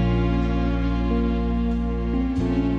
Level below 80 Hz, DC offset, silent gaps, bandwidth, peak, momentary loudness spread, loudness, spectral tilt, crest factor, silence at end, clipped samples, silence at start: -26 dBFS; under 0.1%; none; 6.6 kHz; -10 dBFS; 3 LU; -24 LUFS; -9 dB/octave; 12 dB; 0 s; under 0.1%; 0 s